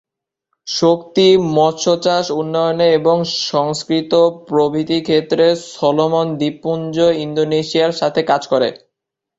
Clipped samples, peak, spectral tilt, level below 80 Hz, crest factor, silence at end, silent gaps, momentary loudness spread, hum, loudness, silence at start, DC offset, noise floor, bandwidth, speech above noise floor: under 0.1%; -2 dBFS; -5 dB/octave; -56 dBFS; 14 dB; 0.6 s; none; 6 LU; none; -15 LUFS; 0.65 s; under 0.1%; -79 dBFS; 8 kHz; 64 dB